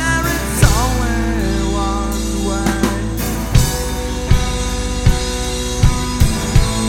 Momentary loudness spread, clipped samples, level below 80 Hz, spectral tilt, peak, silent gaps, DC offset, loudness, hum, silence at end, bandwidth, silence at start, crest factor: 5 LU; under 0.1%; -20 dBFS; -4.5 dB/octave; 0 dBFS; none; under 0.1%; -17 LUFS; none; 0 s; 17 kHz; 0 s; 16 dB